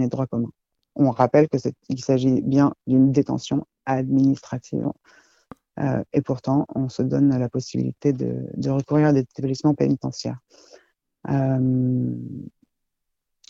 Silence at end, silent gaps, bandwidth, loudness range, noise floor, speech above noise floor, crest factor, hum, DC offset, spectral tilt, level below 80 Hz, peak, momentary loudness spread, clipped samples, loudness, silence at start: 1 s; none; 7.6 kHz; 4 LU; -78 dBFS; 57 dB; 20 dB; none; under 0.1%; -8 dB/octave; -58 dBFS; -2 dBFS; 12 LU; under 0.1%; -22 LUFS; 0 s